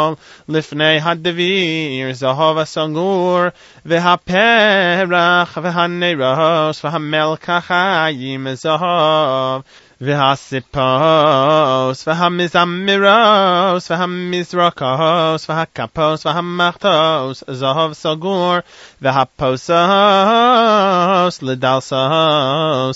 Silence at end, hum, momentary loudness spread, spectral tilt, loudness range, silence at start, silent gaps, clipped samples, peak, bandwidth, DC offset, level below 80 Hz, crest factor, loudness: 0 s; none; 9 LU; -5.5 dB/octave; 4 LU; 0 s; none; under 0.1%; 0 dBFS; 8 kHz; under 0.1%; -54 dBFS; 14 dB; -14 LUFS